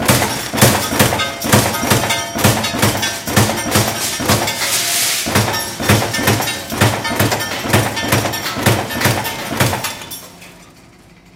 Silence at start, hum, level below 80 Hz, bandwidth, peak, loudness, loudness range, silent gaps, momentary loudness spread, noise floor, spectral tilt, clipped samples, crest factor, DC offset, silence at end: 0 s; none; -40 dBFS; 17 kHz; 0 dBFS; -15 LUFS; 3 LU; none; 5 LU; -44 dBFS; -3.5 dB/octave; under 0.1%; 16 dB; under 0.1%; 0.7 s